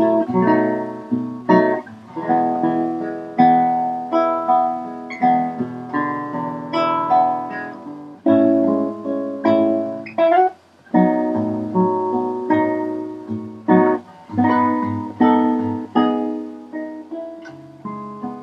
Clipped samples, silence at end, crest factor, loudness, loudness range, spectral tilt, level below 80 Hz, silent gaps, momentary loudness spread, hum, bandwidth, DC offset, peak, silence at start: under 0.1%; 0 s; 18 dB; -19 LUFS; 2 LU; -8.5 dB/octave; -70 dBFS; none; 15 LU; none; 6.4 kHz; under 0.1%; 0 dBFS; 0 s